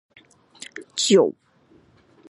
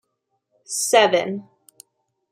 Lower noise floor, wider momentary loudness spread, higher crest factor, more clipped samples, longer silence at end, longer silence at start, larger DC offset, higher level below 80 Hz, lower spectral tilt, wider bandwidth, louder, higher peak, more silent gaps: second, -57 dBFS vs -74 dBFS; first, 22 LU vs 14 LU; about the same, 20 dB vs 22 dB; neither; about the same, 1 s vs 0.9 s; about the same, 0.8 s vs 0.7 s; neither; about the same, -74 dBFS vs -78 dBFS; first, -3.5 dB/octave vs -2 dB/octave; second, 11.5 kHz vs 16 kHz; about the same, -20 LUFS vs -19 LUFS; about the same, -4 dBFS vs -2 dBFS; neither